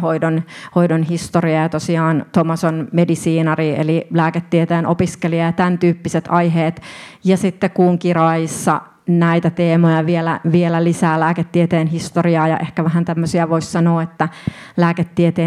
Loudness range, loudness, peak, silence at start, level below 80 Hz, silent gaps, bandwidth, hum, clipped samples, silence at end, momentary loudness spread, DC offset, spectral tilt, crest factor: 2 LU; -16 LUFS; 0 dBFS; 0 s; -52 dBFS; none; 12.5 kHz; none; under 0.1%; 0 s; 4 LU; under 0.1%; -7 dB/octave; 16 dB